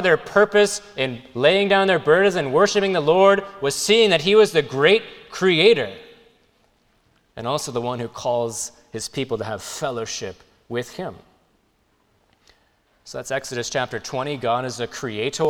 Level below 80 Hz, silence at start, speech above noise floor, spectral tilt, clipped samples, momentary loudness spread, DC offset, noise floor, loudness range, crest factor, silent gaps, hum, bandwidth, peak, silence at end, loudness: -58 dBFS; 0 s; 44 dB; -3.5 dB/octave; under 0.1%; 15 LU; under 0.1%; -64 dBFS; 15 LU; 20 dB; none; none; 15.5 kHz; -2 dBFS; 0 s; -20 LUFS